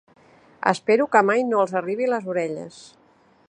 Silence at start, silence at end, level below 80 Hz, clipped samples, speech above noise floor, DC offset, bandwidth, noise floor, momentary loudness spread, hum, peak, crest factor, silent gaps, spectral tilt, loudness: 0.65 s; 0.65 s; -72 dBFS; under 0.1%; 36 dB; under 0.1%; 10.5 kHz; -57 dBFS; 11 LU; none; -2 dBFS; 22 dB; none; -5.5 dB/octave; -21 LUFS